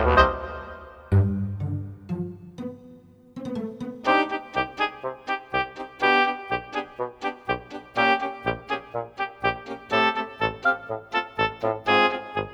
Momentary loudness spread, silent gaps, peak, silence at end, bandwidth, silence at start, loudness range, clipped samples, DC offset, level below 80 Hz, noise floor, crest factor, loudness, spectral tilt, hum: 15 LU; none; -2 dBFS; 0 s; 8.6 kHz; 0 s; 4 LU; under 0.1%; under 0.1%; -42 dBFS; -49 dBFS; 24 dB; -25 LUFS; -6.5 dB/octave; none